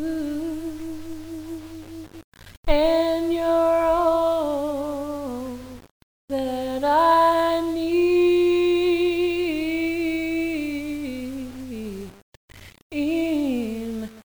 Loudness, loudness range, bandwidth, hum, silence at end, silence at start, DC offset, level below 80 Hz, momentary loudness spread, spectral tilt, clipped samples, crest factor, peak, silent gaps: -22 LUFS; 9 LU; over 20 kHz; none; 0.05 s; 0 s; 0.3%; -40 dBFS; 17 LU; -5.5 dB/octave; under 0.1%; 18 dB; -4 dBFS; 2.24-2.32 s, 2.57-2.63 s, 5.91-6.28 s, 12.22-12.48 s, 12.82-12.90 s